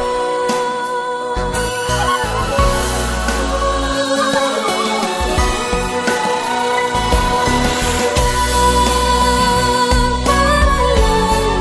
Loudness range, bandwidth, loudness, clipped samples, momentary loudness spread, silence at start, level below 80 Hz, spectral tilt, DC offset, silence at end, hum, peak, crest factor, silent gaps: 4 LU; 11 kHz; -15 LUFS; under 0.1%; 5 LU; 0 s; -22 dBFS; -4 dB/octave; under 0.1%; 0 s; none; 0 dBFS; 14 dB; none